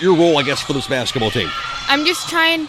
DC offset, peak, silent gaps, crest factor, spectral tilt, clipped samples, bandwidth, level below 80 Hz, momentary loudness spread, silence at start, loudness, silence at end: under 0.1%; 0 dBFS; none; 16 dB; -4 dB/octave; under 0.1%; 15.5 kHz; -44 dBFS; 7 LU; 0 s; -17 LUFS; 0 s